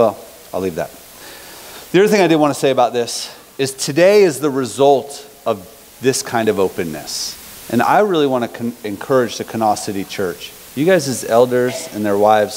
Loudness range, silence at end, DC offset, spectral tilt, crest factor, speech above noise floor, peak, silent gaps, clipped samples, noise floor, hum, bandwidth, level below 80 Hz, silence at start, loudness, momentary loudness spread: 4 LU; 0 s; under 0.1%; -4.5 dB/octave; 16 dB; 21 dB; 0 dBFS; none; under 0.1%; -37 dBFS; none; 16 kHz; -56 dBFS; 0 s; -16 LUFS; 16 LU